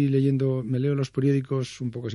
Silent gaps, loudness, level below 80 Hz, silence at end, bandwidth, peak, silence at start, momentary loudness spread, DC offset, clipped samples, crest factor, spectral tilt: none; -25 LUFS; -62 dBFS; 0 s; 11 kHz; -12 dBFS; 0 s; 8 LU; under 0.1%; under 0.1%; 12 dB; -8 dB/octave